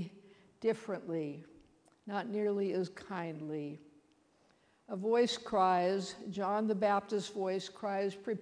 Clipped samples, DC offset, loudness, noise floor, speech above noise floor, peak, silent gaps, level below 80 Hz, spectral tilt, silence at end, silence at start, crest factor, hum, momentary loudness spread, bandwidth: under 0.1%; under 0.1%; -35 LUFS; -70 dBFS; 35 dB; -16 dBFS; none; -76 dBFS; -5.5 dB/octave; 0 s; 0 s; 20 dB; none; 12 LU; 10.5 kHz